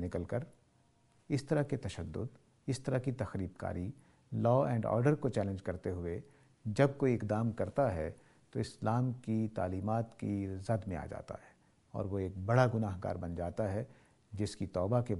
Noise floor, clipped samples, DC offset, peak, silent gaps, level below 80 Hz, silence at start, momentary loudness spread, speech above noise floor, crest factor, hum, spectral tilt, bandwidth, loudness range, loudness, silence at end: -69 dBFS; under 0.1%; under 0.1%; -14 dBFS; none; -60 dBFS; 0 s; 13 LU; 35 dB; 22 dB; none; -8 dB/octave; 11.5 kHz; 4 LU; -36 LUFS; 0 s